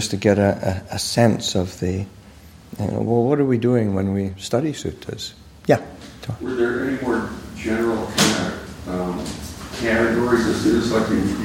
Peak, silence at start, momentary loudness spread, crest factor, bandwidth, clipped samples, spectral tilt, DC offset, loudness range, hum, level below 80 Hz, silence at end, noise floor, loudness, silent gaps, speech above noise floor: -2 dBFS; 0 s; 13 LU; 20 dB; 16.5 kHz; under 0.1%; -5 dB/octave; under 0.1%; 3 LU; none; -44 dBFS; 0 s; -44 dBFS; -21 LUFS; none; 24 dB